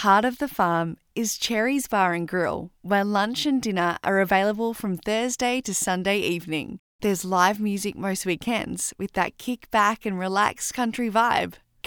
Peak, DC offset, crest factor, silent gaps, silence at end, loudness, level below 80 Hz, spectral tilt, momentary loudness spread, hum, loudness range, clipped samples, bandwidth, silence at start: -6 dBFS; under 0.1%; 18 dB; 6.79-6.99 s; 0.3 s; -24 LUFS; -56 dBFS; -4 dB/octave; 7 LU; none; 2 LU; under 0.1%; over 20 kHz; 0 s